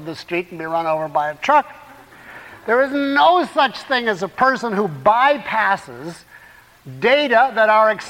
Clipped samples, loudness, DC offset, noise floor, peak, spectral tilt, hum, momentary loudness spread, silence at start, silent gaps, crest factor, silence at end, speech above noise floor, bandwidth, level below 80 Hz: under 0.1%; -17 LUFS; under 0.1%; -46 dBFS; -4 dBFS; -4.5 dB/octave; none; 14 LU; 0 s; none; 16 dB; 0 s; 28 dB; 16.5 kHz; -60 dBFS